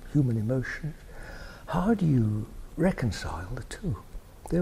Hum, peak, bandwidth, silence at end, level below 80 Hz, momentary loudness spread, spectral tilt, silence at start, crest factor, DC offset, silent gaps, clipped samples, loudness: none; -12 dBFS; 14.5 kHz; 0 s; -42 dBFS; 19 LU; -7.5 dB/octave; 0 s; 16 dB; under 0.1%; none; under 0.1%; -29 LUFS